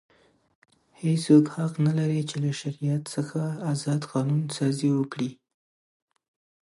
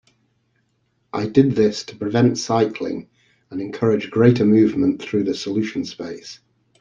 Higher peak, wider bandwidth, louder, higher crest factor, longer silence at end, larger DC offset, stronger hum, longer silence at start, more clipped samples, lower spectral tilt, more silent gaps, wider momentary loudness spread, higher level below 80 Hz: second, -6 dBFS vs -2 dBFS; first, 11.5 kHz vs 7.6 kHz; second, -26 LUFS vs -19 LUFS; about the same, 20 dB vs 18 dB; first, 1.3 s vs 0.45 s; neither; neither; second, 1 s vs 1.15 s; neither; about the same, -7 dB/octave vs -6.5 dB/octave; neither; second, 11 LU vs 16 LU; second, -72 dBFS vs -58 dBFS